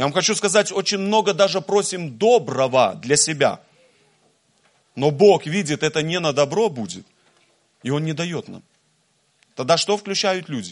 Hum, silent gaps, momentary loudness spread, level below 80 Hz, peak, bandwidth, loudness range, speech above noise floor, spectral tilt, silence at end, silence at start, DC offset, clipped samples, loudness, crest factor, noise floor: none; none; 15 LU; -66 dBFS; -2 dBFS; 11.5 kHz; 7 LU; 45 dB; -3.5 dB/octave; 0 s; 0 s; under 0.1%; under 0.1%; -19 LUFS; 18 dB; -64 dBFS